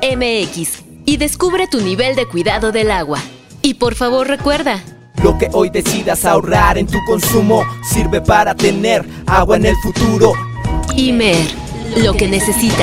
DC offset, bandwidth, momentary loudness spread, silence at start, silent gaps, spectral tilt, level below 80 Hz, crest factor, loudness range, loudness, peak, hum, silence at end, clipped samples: under 0.1%; 16.5 kHz; 8 LU; 0 s; none; -4.5 dB/octave; -26 dBFS; 14 dB; 3 LU; -14 LUFS; 0 dBFS; none; 0 s; under 0.1%